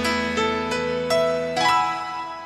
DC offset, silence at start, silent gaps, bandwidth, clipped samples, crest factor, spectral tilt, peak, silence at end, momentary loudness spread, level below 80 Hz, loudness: under 0.1%; 0 s; none; 15 kHz; under 0.1%; 16 dB; -3.5 dB/octave; -8 dBFS; 0 s; 6 LU; -50 dBFS; -22 LUFS